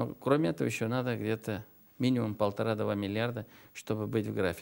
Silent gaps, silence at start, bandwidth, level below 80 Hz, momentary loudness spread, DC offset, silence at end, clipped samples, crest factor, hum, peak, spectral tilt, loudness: none; 0 s; 16 kHz; -66 dBFS; 10 LU; under 0.1%; 0 s; under 0.1%; 20 dB; none; -12 dBFS; -6.5 dB/octave; -32 LUFS